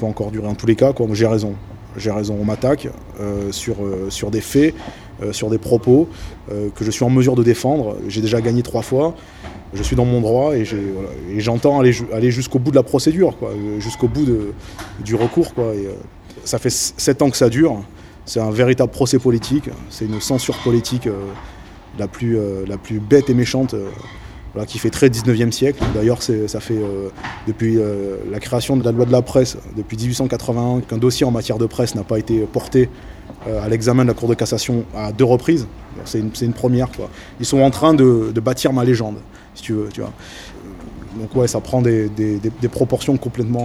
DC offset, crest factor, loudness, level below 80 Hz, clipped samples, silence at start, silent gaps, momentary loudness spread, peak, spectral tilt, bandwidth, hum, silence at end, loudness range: under 0.1%; 18 dB; -18 LUFS; -38 dBFS; under 0.1%; 0 s; none; 16 LU; 0 dBFS; -6 dB/octave; 16 kHz; none; 0 s; 4 LU